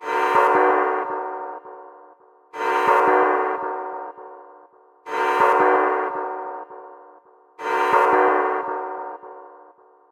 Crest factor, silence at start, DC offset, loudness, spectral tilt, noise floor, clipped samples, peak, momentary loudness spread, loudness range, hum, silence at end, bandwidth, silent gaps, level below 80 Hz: 18 dB; 0 s; under 0.1%; -20 LUFS; -4 dB/octave; -51 dBFS; under 0.1%; -4 dBFS; 22 LU; 2 LU; none; 0.55 s; 16 kHz; none; -74 dBFS